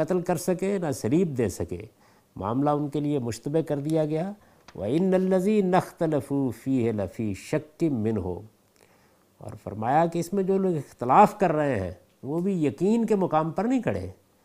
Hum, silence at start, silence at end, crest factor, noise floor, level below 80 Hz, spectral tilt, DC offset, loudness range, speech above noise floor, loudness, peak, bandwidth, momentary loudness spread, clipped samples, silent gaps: none; 0 s; 0.35 s; 22 dB; -61 dBFS; -62 dBFS; -7.5 dB/octave; under 0.1%; 5 LU; 36 dB; -26 LUFS; -4 dBFS; 15.5 kHz; 12 LU; under 0.1%; none